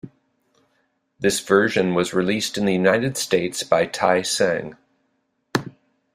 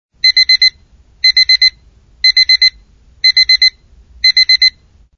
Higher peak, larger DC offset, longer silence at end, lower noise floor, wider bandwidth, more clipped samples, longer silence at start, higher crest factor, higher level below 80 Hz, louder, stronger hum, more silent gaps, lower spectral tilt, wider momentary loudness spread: about the same, -2 dBFS vs 0 dBFS; neither; about the same, 0.45 s vs 0.5 s; first, -70 dBFS vs -46 dBFS; first, 16 kHz vs 6.6 kHz; neither; second, 0.05 s vs 0.25 s; first, 20 dB vs 12 dB; second, -60 dBFS vs -44 dBFS; second, -21 LUFS vs -8 LUFS; neither; neither; first, -4 dB/octave vs 3.5 dB/octave; first, 9 LU vs 5 LU